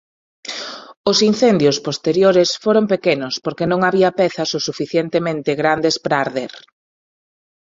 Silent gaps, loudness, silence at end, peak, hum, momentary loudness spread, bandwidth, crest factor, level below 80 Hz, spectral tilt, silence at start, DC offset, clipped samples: 0.97-1.04 s; -17 LUFS; 1.2 s; -2 dBFS; none; 13 LU; 7.8 kHz; 16 dB; -58 dBFS; -4.5 dB/octave; 0.45 s; under 0.1%; under 0.1%